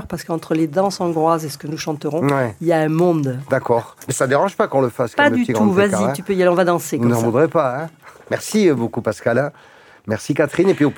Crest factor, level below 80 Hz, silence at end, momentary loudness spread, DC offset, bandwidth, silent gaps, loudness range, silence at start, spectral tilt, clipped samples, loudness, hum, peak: 16 dB; -58 dBFS; 0 s; 10 LU; under 0.1%; 18 kHz; none; 3 LU; 0 s; -6 dB/octave; under 0.1%; -18 LUFS; none; 0 dBFS